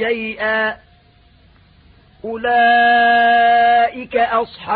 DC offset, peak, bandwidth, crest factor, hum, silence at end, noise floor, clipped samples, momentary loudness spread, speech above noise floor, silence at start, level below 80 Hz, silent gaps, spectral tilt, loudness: under 0.1%; -6 dBFS; 4.8 kHz; 10 dB; none; 0 s; -50 dBFS; under 0.1%; 11 LU; 36 dB; 0 s; -52 dBFS; none; -8.5 dB/octave; -14 LUFS